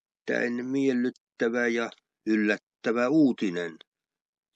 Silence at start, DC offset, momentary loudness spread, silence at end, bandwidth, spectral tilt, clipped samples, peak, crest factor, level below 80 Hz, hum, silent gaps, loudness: 0.25 s; under 0.1%; 10 LU; 0.8 s; 8.2 kHz; -6 dB/octave; under 0.1%; -10 dBFS; 18 dB; -84 dBFS; none; 1.20-1.27 s, 2.63-2.67 s; -27 LUFS